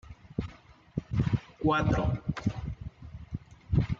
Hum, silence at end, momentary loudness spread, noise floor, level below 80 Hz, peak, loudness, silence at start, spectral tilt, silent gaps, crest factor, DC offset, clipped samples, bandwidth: none; 0.05 s; 16 LU; -53 dBFS; -42 dBFS; -14 dBFS; -32 LUFS; 0.05 s; -8 dB/octave; none; 18 dB; under 0.1%; under 0.1%; 7.4 kHz